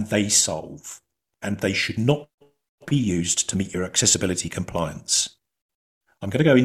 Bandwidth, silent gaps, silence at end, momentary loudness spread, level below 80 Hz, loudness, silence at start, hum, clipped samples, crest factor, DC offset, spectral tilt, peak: 14.5 kHz; 2.34-2.38 s, 2.69-2.78 s, 5.61-5.69 s, 5.75-6.01 s; 0 s; 16 LU; -54 dBFS; -22 LUFS; 0 s; none; under 0.1%; 20 dB; under 0.1%; -3.5 dB/octave; -4 dBFS